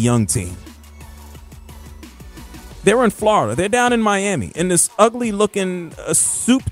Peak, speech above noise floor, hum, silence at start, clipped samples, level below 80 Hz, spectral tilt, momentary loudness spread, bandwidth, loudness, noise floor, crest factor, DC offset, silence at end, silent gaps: 0 dBFS; 22 dB; none; 0 s; under 0.1%; -42 dBFS; -4 dB/octave; 22 LU; 16 kHz; -17 LUFS; -38 dBFS; 18 dB; under 0.1%; 0 s; none